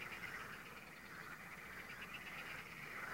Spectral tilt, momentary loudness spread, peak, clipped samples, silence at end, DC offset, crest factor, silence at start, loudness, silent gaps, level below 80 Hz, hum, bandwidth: -3 dB/octave; 5 LU; -36 dBFS; under 0.1%; 0 s; under 0.1%; 16 dB; 0 s; -50 LUFS; none; -72 dBFS; none; 16 kHz